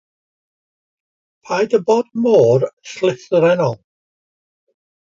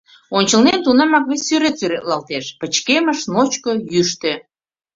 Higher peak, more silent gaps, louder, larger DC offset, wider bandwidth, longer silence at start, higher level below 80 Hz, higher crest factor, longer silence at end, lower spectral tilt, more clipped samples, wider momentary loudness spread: about the same, -2 dBFS vs -2 dBFS; first, 2.73-2.77 s vs none; about the same, -16 LUFS vs -16 LUFS; neither; about the same, 7.6 kHz vs 7.8 kHz; first, 1.5 s vs 0.3 s; second, -64 dBFS vs -58 dBFS; about the same, 18 dB vs 16 dB; first, 1.3 s vs 0.55 s; first, -6.5 dB/octave vs -3 dB/octave; neither; about the same, 10 LU vs 9 LU